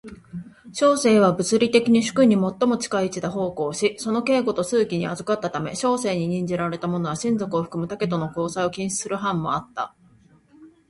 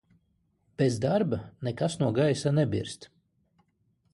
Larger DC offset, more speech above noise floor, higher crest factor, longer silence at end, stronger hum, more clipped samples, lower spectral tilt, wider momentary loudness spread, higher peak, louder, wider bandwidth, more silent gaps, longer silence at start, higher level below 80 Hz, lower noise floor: neither; second, 33 dB vs 45 dB; about the same, 20 dB vs 16 dB; second, 0.2 s vs 1.1 s; neither; neither; second, -5 dB/octave vs -6.5 dB/octave; second, 9 LU vs 12 LU; first, -2 dBFS vs -12 dBFS; first, -22 LUFS vs -28 LUFS; about the same, 11.5 kHz vs 11.5 kHz; neither; second, 0.05 s vs 0.8 s; about the same, -58 dBFS vs -58 dBFS; second, -55 dBFS vs -72 dBFS